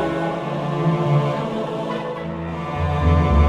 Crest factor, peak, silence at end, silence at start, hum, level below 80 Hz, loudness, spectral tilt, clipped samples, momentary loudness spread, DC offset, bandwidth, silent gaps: 16 dB; -4 dBFS; 0 s; 0 s; none; -28 dBFS; -22 LUFS; -8 dB/octave; under 0.1%; 9 LU; under 0.1%; 9 kHz; none